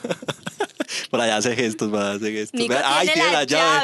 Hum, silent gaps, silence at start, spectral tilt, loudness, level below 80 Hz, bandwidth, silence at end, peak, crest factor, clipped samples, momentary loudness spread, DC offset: none; none; 0 s; -2.5 dB/octave; -21 LUFS; -68 dBFS; 12.5 kHz; 0 s; -4 dBFS; 18 dB; under 0.1%; 11 LU; under 0.1%